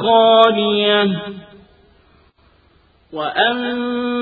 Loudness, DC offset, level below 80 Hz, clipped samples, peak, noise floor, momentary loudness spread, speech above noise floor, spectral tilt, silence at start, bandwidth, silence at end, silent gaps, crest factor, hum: -15 LUFS; under 0.1%; -56 dBFS; under 0.1%; 0 dBFS; -54 dBFS; 19 LU; 39 dB; -7 dB/octave; 0 s; 4.9 kHz; 0 s; none; 18 dB; none